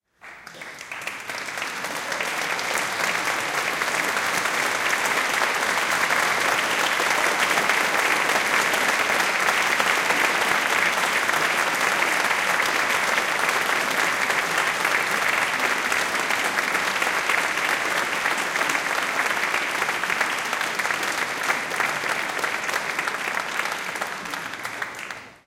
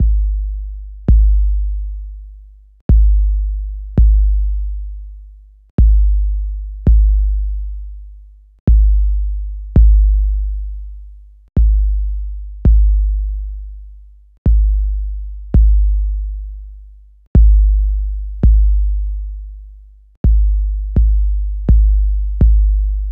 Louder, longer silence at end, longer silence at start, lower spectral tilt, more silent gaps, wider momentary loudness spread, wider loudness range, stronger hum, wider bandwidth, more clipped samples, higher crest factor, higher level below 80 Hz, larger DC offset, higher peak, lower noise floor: second, -22 LUFS vs -17 LUFS; about the same, 0.1 s vs 0 s; first, 0.25 s vs 0 s; second, -0.5 dB/octave vs -12.5 dB/octave; second, none vs 2.81-2.89 s, 5.70-5.78 s, 8.60-8.67 s, 14.38-14.45 s, 17.27-17.35 s, 20.17-20.24 s; second, 9 LU vs 17 LU; first, 5 LU vs 2 LU; second, none vs 50 Hz at -20 dBFS; first, 17 kHz vs 0.9 kHz; neither; first, 20 dB vs 12 dB; second, -64 dBFS vs -14 dBFS; neither; second, -4 dBFS vs 0 dBFS; first, -44 dBFS vs -39 dBFS